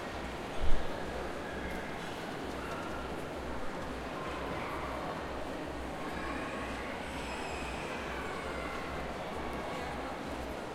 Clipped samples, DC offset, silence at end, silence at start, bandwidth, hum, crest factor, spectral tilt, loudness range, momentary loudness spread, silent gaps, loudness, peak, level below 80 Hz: under 0.1%; under 0.1%; 0 s; 0 s; 14 kHz; none; 22 dB; -5 dB/octave; 1 LU; 2 LU; none; -39 LUFS; -12 dBFS; -44 dBFS